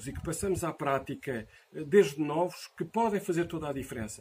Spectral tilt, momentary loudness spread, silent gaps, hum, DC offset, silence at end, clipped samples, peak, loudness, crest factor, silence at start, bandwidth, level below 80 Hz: -5.5 dB/octave; 14 LU; none; none; under 0.1%; 0 s; under 0.1%; -10 dBFS; -31 LUFS; 20 dB; 0 s; 15.5 kHz; -54 dBFS